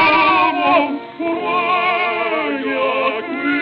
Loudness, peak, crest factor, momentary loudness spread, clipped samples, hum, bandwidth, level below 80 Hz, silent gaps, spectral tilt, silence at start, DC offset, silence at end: -17 LUFS; -2 dBFS; 14 dB; 8 LU; under 0.1%; none; 6 kHz; -58 dBFS; none; -6.5 dB/octave; 0 s; under 0.1%; 0 s